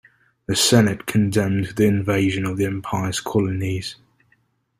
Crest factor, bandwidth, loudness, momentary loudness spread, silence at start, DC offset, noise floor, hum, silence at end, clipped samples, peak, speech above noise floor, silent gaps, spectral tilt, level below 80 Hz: 18 dB; 16 kHz; -20 LUFS; 10 LU; 0.5 s; under 0.1%; -64 dBFS; none; 0.85 s; under 0.1%; -2 dBFS; 44 dB; none; -5 dB/octave; -52 dBFS